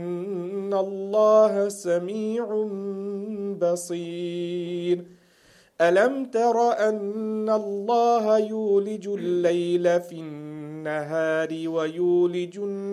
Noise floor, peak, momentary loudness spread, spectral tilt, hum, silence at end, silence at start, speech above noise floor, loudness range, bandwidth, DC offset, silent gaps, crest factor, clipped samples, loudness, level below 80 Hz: -57 dBFS; -6 dBFS; 11 LU; -6 dB/octave; none; 0 s; 0 s; 34 dB; 5 LU; 13 kHz; under 0.1%; none; 18 dB; under 0.1%; -24 LUFS; -78 dBFS